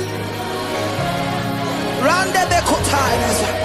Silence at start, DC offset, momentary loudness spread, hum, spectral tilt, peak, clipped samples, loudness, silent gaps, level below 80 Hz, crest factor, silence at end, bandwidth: 0 s; under 0.1%; 8 LU; none; -4 dB/octave; -2 dBFS; under 0.1%; -18 LUFS; none; -38 dBFS; 16 dB; 0 s; 15.5 kHz